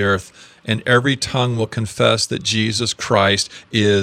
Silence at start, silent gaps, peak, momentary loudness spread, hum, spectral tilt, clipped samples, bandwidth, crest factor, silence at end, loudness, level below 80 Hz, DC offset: 0 s; none; 0 dBFS; 7 LU; none; -4 dB/octave; under 0.1%; 14.5 kHz; 18 dB; 0 s; -18 LUFS; -52 dBFS; under 0.1%